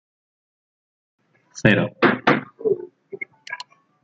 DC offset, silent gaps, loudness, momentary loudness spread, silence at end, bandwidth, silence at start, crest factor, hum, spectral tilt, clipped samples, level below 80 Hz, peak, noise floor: under 0.1%; none; -20 LUFS; 19 LU; 0.45 s; 8 kHz; 1.55 s; 22 dB; none; -6 dB/octave; under 0.1%; -56 dBFS; -2 dBFS; -39 dBFS